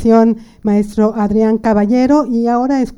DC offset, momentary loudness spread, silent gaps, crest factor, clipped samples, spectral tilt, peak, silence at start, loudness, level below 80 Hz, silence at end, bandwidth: under 0.1%; 4 LU; none; 12 dB; under 0.1%; -8 dB/octave; 0 dBFS; 0 s; -13 LUFS; -38 dBFS; 0.05 s; 11 kHz